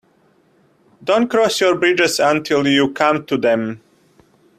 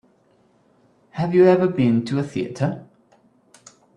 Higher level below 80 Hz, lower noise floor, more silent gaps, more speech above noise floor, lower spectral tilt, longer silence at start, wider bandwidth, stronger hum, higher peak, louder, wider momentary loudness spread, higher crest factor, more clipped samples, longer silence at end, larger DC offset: about the same, -60 dBFS vs -60 dBFS; about the same, -56 dBFS vs -59 dBFS; neither; about the same, 41 dB vs 41 dB; second, -4 dB/octave vs -8 dB/octave; second, 1 s vs 1.15 s; first, 16 kHz vs 9.8 kHz; neither; first, 0 dBFS vs -4 dBFS; first, -16 LUFS vs -20 LUFS; second, 6 LU vs 13 LU; about the same, 18 dB vs 18 dB; neither; second, 0.8 s vs 1.15 s; neither